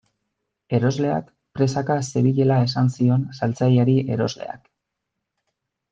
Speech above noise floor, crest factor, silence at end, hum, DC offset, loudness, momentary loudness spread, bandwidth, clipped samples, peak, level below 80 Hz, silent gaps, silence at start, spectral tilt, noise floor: 61 dB; 16 dB; 1.35 s; none; under 0.1%; -21 LUFS; 10 LU; 7.8 kHz; under 0.1%; -6 dBFS; -60 dBFS; none; 0.7 s; -7.5 dB/octave; -81 dBFS